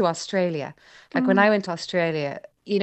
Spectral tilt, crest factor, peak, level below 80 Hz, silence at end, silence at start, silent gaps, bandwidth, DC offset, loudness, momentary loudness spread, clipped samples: -5.5 dB/octave; 20 dB; -4 dBFS; -70 dBFS; 0 s; 0 s; none; 8.6 kHz; under 0.1%; -23 LUFS; 13 LU; under 0.1%